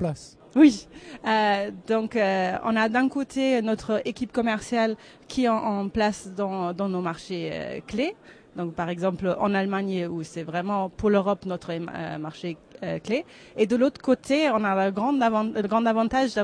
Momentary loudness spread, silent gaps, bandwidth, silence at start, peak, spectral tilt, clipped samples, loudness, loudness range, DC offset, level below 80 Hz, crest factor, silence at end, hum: 11 LU; none; 10.5 kHz; 0 s; -6 dBFS; -6 dB/octave; under 0.1%; -25 LUFS; 5 LU; under 0.1%; -56 dBFS; 20 dB; 0 s; none